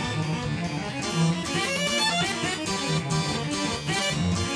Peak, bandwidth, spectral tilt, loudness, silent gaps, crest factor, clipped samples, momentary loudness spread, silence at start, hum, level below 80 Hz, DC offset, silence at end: -12 dBFS; 11 kHz; -4 dB/octave; -26 LUFS; none; 14 dB; under 0.1%; 6 LU; 0 s; none; -48 dBFS; under 0.1%; 0 s